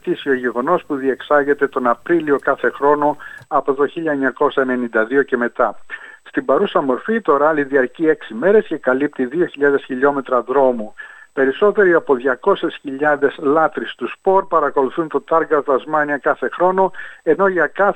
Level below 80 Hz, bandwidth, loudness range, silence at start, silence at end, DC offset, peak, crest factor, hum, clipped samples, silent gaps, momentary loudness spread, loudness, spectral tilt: -58 dBFS; 8.4 kHz; 1 LU; 0.05 s; 0 s; under 0.1%; -2 dBFS; 16 dB; none; under 0.1%; none; 6 LU; -17 LUFS; -7 dB/octave